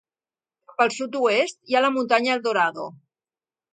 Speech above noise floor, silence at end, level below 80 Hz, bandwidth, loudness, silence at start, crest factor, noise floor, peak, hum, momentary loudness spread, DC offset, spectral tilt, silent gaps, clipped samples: over 68 dB; 0.8 s; -78 dBFS; 9.4 kHz; -22 LUFS; 0.8 s; 20 dB; under -90 dBFS; -4 dBFS; none; 11 LU; under 0.1%; -3 dB/octave; none; under 0.1%